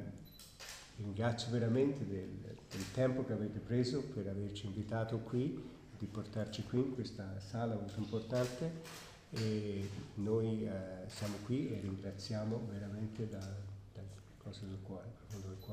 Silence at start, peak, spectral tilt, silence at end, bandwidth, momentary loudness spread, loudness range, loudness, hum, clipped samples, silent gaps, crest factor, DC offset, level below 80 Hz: 0 s; -22 dBFS; -6.5 dB/octave; 0 s; 15.5 kHz; 14 LU; 5 LU; -41 LUFS; none; under 0.1%; none; 18 dB; under 0.1%; -64 dBFS